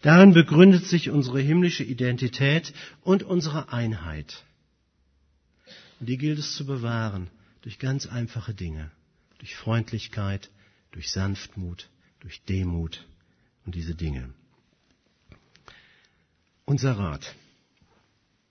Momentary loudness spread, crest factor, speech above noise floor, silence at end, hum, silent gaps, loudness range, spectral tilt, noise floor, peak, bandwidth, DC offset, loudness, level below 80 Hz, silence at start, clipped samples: 24 LU; 22 dB; 45 dB; 1.2 s; none; none; 10 LU; -6.5 dB/octave; -68 dBFS; -2 dBFS; 6.6 kHz; under 0.1%; -23 LUFS; -48 dBFS; 0 s; under 0.1%